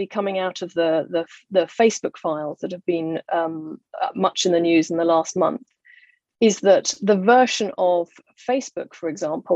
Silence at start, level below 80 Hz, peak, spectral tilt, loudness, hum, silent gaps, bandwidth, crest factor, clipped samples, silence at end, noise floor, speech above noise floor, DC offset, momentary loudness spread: 0 s; -72 dBFS; -2 dBFS; -4 dB/octave; -21 LUFS; none; none; 8.4 kHz; 18 dB; under 0.1%; 0 s; -54 dBFS; 34 dB; under 0.1%; 12 LU